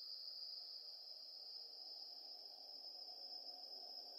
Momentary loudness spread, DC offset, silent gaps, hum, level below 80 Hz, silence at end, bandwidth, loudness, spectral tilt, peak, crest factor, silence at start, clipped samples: 3 LU; under 0.1%; none; none; under -90 dBFS; 0 s; 15.5 kHz; -51 LUFS; 1 dB/octave; -40 dBFS; 14 dB; 0 s; under 0.1%